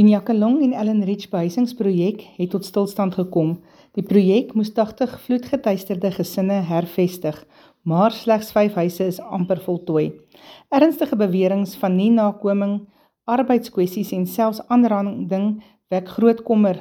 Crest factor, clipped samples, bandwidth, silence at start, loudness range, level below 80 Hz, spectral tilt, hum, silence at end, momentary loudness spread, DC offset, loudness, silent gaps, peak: 16 dB; under 0.1%; 18 kHz; 0 s; 2 LU; -64 dBFS; -7.5 dB/octave; none; 0 s; 9 LU; under 0.1%; -20 LUFS; none; -2 dBFS